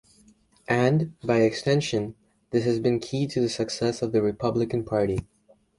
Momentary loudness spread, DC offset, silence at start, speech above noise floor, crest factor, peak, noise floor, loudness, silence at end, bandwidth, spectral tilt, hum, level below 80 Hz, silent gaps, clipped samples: 6 LU; under 0.1%; 0.7 s; 34 dB; 18 dB; -8 dBFS; -59 dBFS; -25 LUFS; 0.55 s; 11.5 kHz; -6 dB/octave; none; -54 dBFS; none; under 0.1%